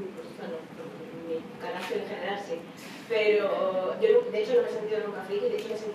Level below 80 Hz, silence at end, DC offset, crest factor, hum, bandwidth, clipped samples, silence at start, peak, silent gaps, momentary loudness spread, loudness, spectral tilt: -76 dBFS; 0 s; under 0.1%; 18 dB; none; 14 kHz; under 0.1%; 0 s; -12 dBFS; none; 16 LU; -29 LUFS; -5 dB/octave